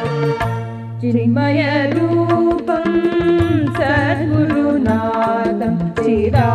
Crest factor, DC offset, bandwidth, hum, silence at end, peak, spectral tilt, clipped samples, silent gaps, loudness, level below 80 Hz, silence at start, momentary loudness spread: 14 dB; under 0.1%; 9.8 kHz; none; 0 s; -2 dBFS; -8.5 dB/octave; under 0.1%; none; -16 LUFS; -40 dBFS; 0 s; 4 LU